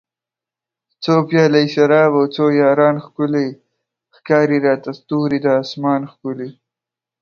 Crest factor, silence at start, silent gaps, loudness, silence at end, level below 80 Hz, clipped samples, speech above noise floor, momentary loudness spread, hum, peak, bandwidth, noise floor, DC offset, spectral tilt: 16 dB; 1 s; none; -16 LUFS; 0.7 s; -64 dBFS; under 0.1%; 73 dB; 13 LU; none; 0 dBFS; 6.8 kHz; -88 dBFS; under 0.1%; -7 dB/octave